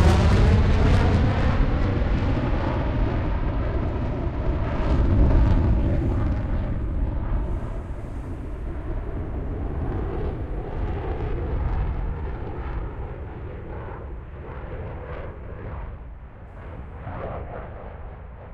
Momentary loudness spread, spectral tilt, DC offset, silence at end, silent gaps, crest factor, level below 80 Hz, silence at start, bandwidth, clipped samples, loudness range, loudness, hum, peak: 17 LU; -8 dB/octave; under 0.1%; 0 s; none; 18 dB; -26 dBFS; 0 s; 9.2 kHz; under 0.1%; 13 LU; -26 LUFS; none; -4 dBFS